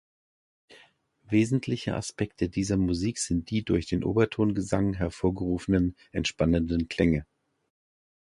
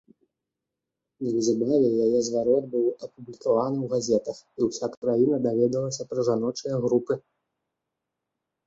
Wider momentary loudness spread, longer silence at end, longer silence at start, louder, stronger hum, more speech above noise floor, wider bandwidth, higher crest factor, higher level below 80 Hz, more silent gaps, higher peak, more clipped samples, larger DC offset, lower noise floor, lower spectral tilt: second, 6 LU vs 9 LU; second, 1.1 s vs 1.45 s; second, 0.7 s vs 1.2 s; second, -28 LUFS vs -25 LUFS; neither; second, 34 dB vs 61 dB; first, 11.5 kHz vs 8 kHz; about the same, 20 dB vs 16 dB; first, -44 dBFS vs -68 dBFS; second, none vs 4.97-5.02 s; about the same, -8 dBFS vs -10 dBFS; neither; neither; second, -61 dBFS vs -86 dBFS; about the same, -6 dB/octave vs -6.5 dB/octave